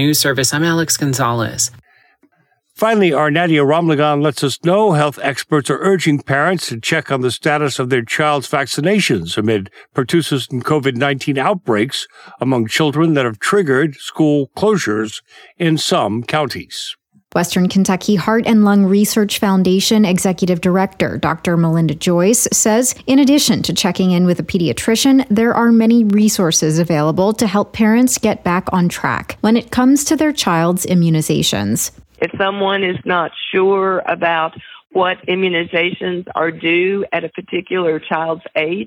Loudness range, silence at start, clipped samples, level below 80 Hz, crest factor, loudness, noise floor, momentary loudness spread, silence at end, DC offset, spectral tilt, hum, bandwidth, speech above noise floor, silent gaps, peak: 4 LU; 0 s; under 0.1%; -50 dBFS; 14 dB; -15 LUFS; -60 dBFS; 7 LU; 0 s; under 0.1%; -4.5 dB/octave; none; 17 kHz; 45 dB; none; 0 dBFS